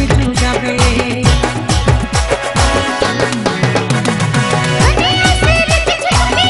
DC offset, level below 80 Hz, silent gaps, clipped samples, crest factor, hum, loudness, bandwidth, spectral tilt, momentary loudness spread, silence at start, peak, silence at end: under 0.1%; -20 dBFS; none; under 0.1%; 12 dB; none; -13 LUFS; 12 kHz; -4.5 dB/octave; 4 LU; 0 s; 0 dBFS; 0 s